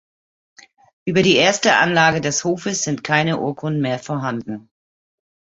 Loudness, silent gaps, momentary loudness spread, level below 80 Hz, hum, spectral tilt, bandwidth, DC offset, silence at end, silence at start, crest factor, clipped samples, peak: -18 LUFS; none; 12 LU; -58 dBFS; none; -3.5 dB/octave; 8.2 kHz; under 0.1%; 0.95 s; 1.05 s; 20 dB; under 0.1%; 0 dBFS